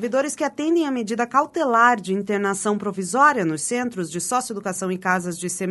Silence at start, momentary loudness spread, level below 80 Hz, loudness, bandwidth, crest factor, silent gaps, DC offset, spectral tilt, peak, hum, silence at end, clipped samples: 0 s; 9 LU; -66 dBFS; -21 LUFS; 12 kHz; 18 dB; none; under 0.1%; -4 dB/octave; -4 dBFS; none; 0 s; under 0.1%